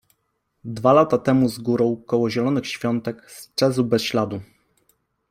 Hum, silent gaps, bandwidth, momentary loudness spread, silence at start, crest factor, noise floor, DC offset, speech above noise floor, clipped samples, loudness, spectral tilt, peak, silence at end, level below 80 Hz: none; none; 16 kHz; 15 LU; 0.65 s; 20 dB; -72 dBFS; under 0.1%; 52 dB; under 0.1%; -21 LUFS; -6 dB/octave; -2 dBFS; 0.85 s; -58 dBFS